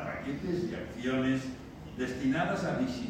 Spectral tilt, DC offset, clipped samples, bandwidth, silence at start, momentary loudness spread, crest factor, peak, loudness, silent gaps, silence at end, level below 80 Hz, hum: -6.5 dB/octave; under 0.1%; under 0.1%; 9.8 kHz; 0 s; 9 LU; 14 dB; -18 dBFS; -33 LUFS; none; 0 s; -54 dBFS; none